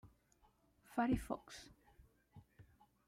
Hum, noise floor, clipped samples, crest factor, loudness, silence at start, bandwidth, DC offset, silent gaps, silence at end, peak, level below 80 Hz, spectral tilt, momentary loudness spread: none; -74 dBFS; under 0.1%; 20 dB; -41 LUFS; 0.05 s; 15.5 kHz; under 0.1%; none; 0.45 s; -26 dBFS; -62 dBFS; -6 dB/octave; 24 LU